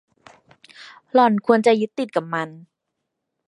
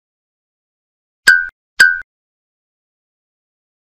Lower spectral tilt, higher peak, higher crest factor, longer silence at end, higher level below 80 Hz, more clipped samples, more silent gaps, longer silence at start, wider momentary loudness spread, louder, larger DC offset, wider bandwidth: first, -6 dB/octave vs 1.5 dB/octave; about the same, -2 dBFS vs 0 dBFS; about the same, 20 dB vs 20 dB; second, 0.9 s vs 1.9 s; second, -76 dBFS vs -58 dBFS; neither; second, none vs 1.52-1.77 s; second, 0.8 s vs 1.25 s; about the same, 11 LU vs 12 LU; second, -19 LUFS vs -11 LUFS; neither; second, 11 kHz vs 16 kHz